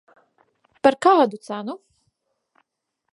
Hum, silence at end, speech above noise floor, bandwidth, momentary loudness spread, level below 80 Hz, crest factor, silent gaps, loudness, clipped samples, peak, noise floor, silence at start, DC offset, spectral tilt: none; 1.35 s; 60 dB; 11.5 kHz; 18 LU; -68 dBFS; 22 dB; none; -19 LUFS; under 0.1%; -2 dBFS; -79 dBFS; 0.85 s; under 0.1%; -5 dB/octave